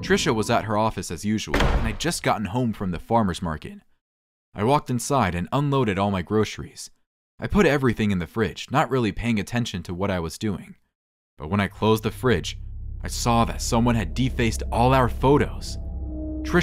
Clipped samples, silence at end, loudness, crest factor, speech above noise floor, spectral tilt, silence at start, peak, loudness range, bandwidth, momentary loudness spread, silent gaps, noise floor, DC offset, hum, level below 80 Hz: under 0.1%; 0 s; -24 LUFS; 18 dB; over 67 dB; -5.5 dB/octave; 0 s; -4 dBFS; 4 LU; 16 kHz; 13 LU; 4.01-4.52 s, 7.06-7.38 s, 10.95-11.37 s; under -90 dBFS; under 0.1%; none; -34 dBFS